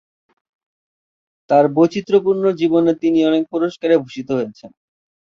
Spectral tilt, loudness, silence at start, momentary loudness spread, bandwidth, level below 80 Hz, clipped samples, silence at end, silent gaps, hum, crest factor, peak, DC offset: -7.5 dB/octave; -17 LUFS; 1.5 s; 8 LU; 7 kHz; -62 dBFS; under 0.1%; 0.7 s; none; none; 16 dB; -2 dBFS; under 0.1%